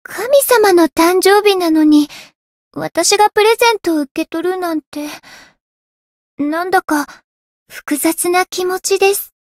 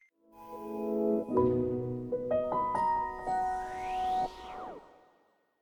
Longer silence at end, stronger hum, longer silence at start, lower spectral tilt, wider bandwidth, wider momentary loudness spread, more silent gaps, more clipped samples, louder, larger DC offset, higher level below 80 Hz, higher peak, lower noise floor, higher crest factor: second, 0.15 s vs 0.75 s; neither; second, 0.1 s vs 0.35 s; second, -2 dB/octave vs -7.5 dB/octave; second, 16.5 kHz vs 19 kHz; about the same, 15 LU vs 15 LU; first, 2.35-2.71 s, 4.11-4.15 s, 4.87-4.92 s, 5.60-6.37 s, 7.24-7.66 s vs none; neither; first, -13 LUFS vs -32 LUFS; neither; about the same, -56 dBFS vs -58 dBFS; first, 0 dBFS vs -16 dBFS; first, under -90 dBFS vs -70 dBFS; about the same, 14 dB vs 18 dB